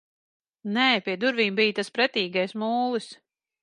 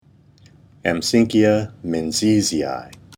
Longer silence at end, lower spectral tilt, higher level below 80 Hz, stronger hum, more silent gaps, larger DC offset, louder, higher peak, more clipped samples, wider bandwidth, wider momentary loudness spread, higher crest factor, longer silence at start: first, 0.5 s vs 0 s; about the same, -4.5 dB/octave vs -4.5 dB/octave; second, -80 dBFS vs -52 dBFS; neither; neither; neither; second, -24 LUFS vs -19 LUFS; about the same, -6 dBFS vs -4 dBFS; neither; second, 11 kHz vs 17 kHz; about the same, 9 LU vs 10 LU; about the same, 20 dB vs 16 dB; second, 0.65 s vs 0.85 s